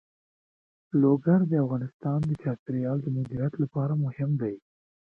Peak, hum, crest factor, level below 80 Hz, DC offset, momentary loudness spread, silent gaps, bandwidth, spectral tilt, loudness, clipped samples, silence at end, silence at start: -12 dBFS; none; 16 dB; -62 dBFS; under 0.1%; 8 LU; 1.94-2.00 s, 2.59-2.66 s; 3.4 kHz; -12 dB/octave; -27 LUFS; under 0.1%; 0.55 s; 0.95 s